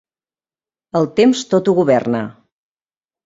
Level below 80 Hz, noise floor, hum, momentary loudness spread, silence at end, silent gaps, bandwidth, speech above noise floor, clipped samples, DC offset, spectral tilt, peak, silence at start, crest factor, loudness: -60 dBFS; under -90 dBFS; none; 9 LU; 0.95 s; none; 7.8 kHz; over 75 dB; under 0.1%; under 0.1%; -6 dB/octave; -2 dBFS; 0.95 s; 16 dB; -16 LUFS